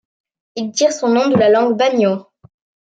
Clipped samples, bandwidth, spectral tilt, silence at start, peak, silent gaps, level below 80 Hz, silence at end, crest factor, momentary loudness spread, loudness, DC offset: under 0.1%; 9.2 kHz; -4.5 dB/octave; 0.55 s; -4 dBFS; none; -66 dBFS; 0.7 s; 14 dB; 14 LU; -15 LUFS; under 0.1%